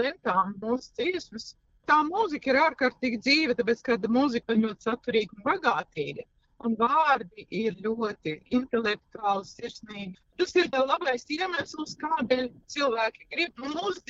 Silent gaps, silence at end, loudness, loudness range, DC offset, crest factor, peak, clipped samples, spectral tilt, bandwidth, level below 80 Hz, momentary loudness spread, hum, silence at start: none; 0.1 s; -27 LUFS; 4 LU; under 0.1%; 20 dB; -8 dBFS; under 0.1%; -4.5 dB/octave; 7.8 kHz; -64 dBFS; 13 LU; none; 0 s